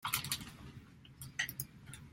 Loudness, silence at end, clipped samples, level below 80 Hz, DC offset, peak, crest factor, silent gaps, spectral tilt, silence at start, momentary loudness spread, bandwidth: -40 LUFS; 0 s; under 0.1%; -64 dBFS; under 0.1%; -16 dBFS; 28 dB; none; -1.5 dB/octave; 0 s; 18 LU; 16.5 kHz